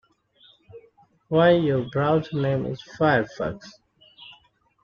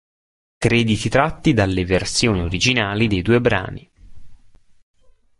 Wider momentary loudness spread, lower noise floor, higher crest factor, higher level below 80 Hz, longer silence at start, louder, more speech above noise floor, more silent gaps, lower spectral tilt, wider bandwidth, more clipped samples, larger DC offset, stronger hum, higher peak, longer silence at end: first, 13 LU vs 5 LU; first, -59 dBFS vs -47 dBFS; about the same, 18 dB vs 18 dB; second, -56 dBFS vs -38 dBFS; first, 0.75 s vs 0.6 s; second, -23 LUFS vs -18 LUFS; first, 37 dB vs 30 dB; neither; first, -8 dB/octave vs -5 dB/octave; second, 7 kHz vs 11.5 kHz; neither; neither; neither; second, -6 dBFS vs -2 dBFS; second, 0.5 s vs 1.05 s